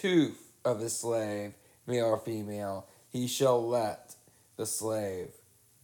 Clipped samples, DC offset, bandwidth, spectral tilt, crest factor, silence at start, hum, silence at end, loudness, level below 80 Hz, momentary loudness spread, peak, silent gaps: under 0.1%; under 0.1%; 19.5 kHz; -4.5 dB/octave; 18 dB; 0 s; none; 0.5 s; -32 LUFS; -76 dBFS; 17 LU; -14 dBFS; none